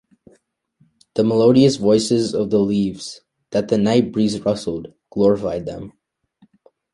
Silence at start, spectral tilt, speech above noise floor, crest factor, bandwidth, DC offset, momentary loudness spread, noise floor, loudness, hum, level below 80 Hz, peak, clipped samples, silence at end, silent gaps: 1.15 s; -6.5 dB/octave; 43 dB; 16 dB; 11.5 kHz; under 0.1%; 17 LU; -61 dBFS; -18 LUFS; none; -52 dBFS; -2 dBFS; under 0.1%; 1.05 s; none